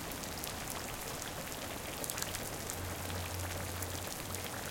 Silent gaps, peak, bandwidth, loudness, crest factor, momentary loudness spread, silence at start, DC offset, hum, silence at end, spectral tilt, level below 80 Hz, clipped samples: none; -14 dBFS; 17 kHz; -40 LUFS; 26 dB; 3 LU; 0 s; under 0.1%; none; 0 s; -3 dB/octave; -56 dBFS; under 0.1%